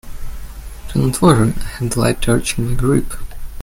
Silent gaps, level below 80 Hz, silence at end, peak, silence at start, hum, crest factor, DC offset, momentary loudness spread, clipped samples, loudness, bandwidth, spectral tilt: none; -26 dBFS; 0 s; 0 dBFS; 0.05 s; none; 16 dB; under 0.1%; 22 LU; under 0.1%; -17 LUFS; 16.5 kHz; -6 dB/octave